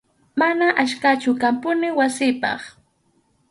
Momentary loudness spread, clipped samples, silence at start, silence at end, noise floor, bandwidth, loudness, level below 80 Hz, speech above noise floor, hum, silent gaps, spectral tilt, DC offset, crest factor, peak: 9 LU; under 0.1%; 0.35 s; 0.8 s; -64 dBFS; 11.5 kHz; -20 LUFS; -66 dBFS; 44 dB; none; none; -3.5 dB/octave; under 0.1%; 16 dB; -4 dBFS